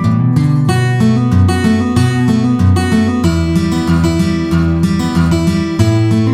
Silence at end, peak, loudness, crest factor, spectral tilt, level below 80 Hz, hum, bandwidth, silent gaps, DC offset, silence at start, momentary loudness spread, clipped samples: 0 s; 0 dBFS; -12 LUFS; 10 dB; -7 dB/octave; -28 dBFS; none; 15 kHz; none; under 0.1%; 0 s; 2 LU; under 0.1%